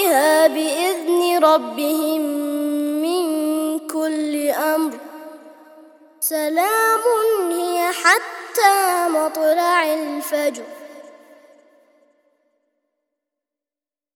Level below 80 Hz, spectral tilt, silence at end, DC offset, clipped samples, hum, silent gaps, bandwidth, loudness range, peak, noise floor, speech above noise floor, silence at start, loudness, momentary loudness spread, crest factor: -80 dBFS; -0.5 dB/octave; 3.1 s; under 0.1%; under 0.1%; none; none; 20 kHz; 6 LU; 0 dBFS; under -90 dBFS; over 72 dB; 0 s; -19 LUFS; 9 LU; 20 dB